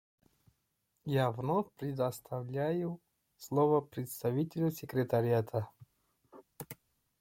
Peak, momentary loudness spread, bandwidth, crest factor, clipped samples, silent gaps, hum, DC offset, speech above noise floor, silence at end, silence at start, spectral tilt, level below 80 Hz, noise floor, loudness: -18 dBFS; 18 LU; 16.5 kHz; 18 dB; under 0.1%; none; none; under 0.1%; 47 dB; 0.45 s; 1.05 s; -7.5 dB/octave; -72 dBFS; -80 dBFS; -34 LUFS